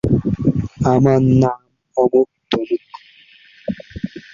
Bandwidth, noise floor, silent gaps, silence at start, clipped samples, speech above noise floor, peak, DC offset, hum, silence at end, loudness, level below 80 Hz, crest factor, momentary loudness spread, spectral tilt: 7.4 kHz; -48 dBFS; none; 0.05 s; under 0.1%; 34 dB; -2 dBFS; under 0.1%; none; 0.15 s; -17 LUFS; -40 dBFS; 16 dB; 16 LU; -8.5 dB/octave